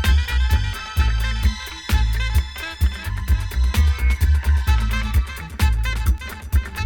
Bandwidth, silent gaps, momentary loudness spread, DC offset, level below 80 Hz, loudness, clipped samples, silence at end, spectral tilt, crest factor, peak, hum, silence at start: 17 kHz; none; 5 LU; under 0.1%; -20 dBFS; -22 LUFS; under 0.1%; 0 s; -4.5 dB/octave; 12 dB; -6 dBFS; none; 0 s